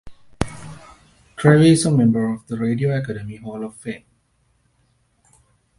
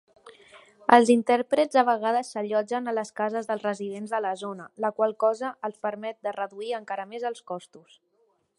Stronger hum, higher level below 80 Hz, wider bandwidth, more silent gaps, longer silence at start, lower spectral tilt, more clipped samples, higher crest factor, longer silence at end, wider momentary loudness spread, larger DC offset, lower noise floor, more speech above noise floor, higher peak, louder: neither; first, -46 dBFS vs -78 dBFS; about the same, 11.5 kHz vs 11.5 kHz; neither; second, 0.05 s vs 0.25 s; first, -6.5 dB/octave vs -4.5 dB/octave; neither; second, 20 dB vs 26 dB; first, 1.8 s vs 0.8 s; first, 22 LU vs 13 LU; neither; second, -64 dBFS vs -69 dBFS; about the same, 46 dB vs 43 dB; about the same, 0 dBFS vs 0 dBFS; first, -19 LUFS vs -26 LUFS